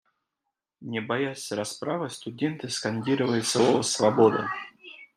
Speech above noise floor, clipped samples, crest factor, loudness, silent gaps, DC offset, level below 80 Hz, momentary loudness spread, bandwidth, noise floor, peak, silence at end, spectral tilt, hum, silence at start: 59 dB; under 0.1%; 20 dB; -26 LUFS; none; under 0.1%; -70 dBFS; 13 LU; 15 kHz; -84 dBFS; -6 dBFS; 0.1 s; -4.5 dB/octave; none; 0.8 s